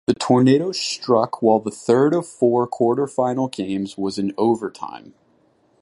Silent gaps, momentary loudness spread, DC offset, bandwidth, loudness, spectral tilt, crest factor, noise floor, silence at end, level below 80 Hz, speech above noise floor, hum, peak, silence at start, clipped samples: none; 9 LU; under 0.1%; 11.5 kHz; -20 LUFS; -6 dB/octave; 16 dB; -60 dBFS; 0.85 s; -62 dBFS; 41 dB; none; -2 dBFS; 0.1 s; under 0.1%